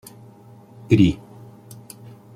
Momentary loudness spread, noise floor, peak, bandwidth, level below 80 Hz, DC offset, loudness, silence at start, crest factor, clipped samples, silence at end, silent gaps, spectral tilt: 26 LU; -46 dBFS; -2 dBFS; 14.5 kHz; -46 dBFS; under 0.1%; -18 LUFS; 0.9 s; 22 dB; under 0.1%; 1.2 s; none; -7.5 dB/octave